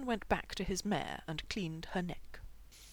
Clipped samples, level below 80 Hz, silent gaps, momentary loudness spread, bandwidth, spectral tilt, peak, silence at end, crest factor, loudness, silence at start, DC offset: under 0.1%; -52 dBFS; none; 20 LU; over 20 kHz; -4.5 dB/octave; -18 dBFS; 0 s; 22 dB; -38 LUFS; 0 s; under 0.1%